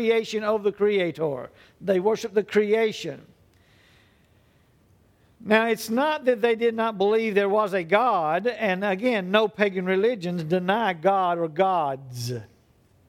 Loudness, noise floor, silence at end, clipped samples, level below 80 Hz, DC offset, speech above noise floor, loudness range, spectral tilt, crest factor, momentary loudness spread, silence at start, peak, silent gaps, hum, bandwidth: -24 LUFS; -60 dBFS; 0.6 s; under 0.1%; -68 dBFS; under 0.1%; 37 dB; 6 LU; -5.5 dB/octave; 20 dB; 11 LU; 0 s; -6 dBFS; none; none; 16.5 kHz